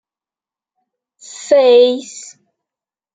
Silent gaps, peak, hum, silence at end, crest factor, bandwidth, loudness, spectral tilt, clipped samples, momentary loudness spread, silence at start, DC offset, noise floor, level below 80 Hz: none; -2 dBFS; none; 0.95 s; 16 dB; 9.2 kHz; -12 LUFS; -1.5 dB/octave; under 0.1%; 24 LU; 1.35 s; under 0.1%; under -90 dBFS; -72 dBFS